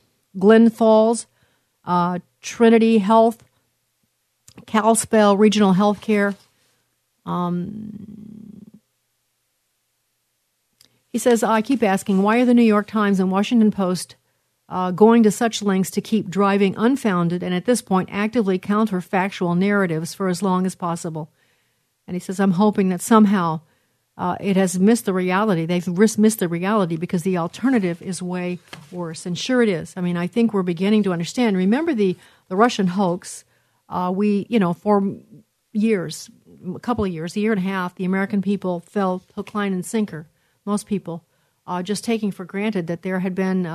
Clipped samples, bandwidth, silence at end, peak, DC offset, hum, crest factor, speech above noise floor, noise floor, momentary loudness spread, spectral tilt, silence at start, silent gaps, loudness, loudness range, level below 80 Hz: under 0.1%; 13.5 kHz; 0 s; 0 dBFS; under 0.1%; none; 20 dB; 52 dB; -71 dBFS; 15 LU; -6 dB/octave; 0.35 s; none; -20 LUFS; 8 LU; -62 dBFS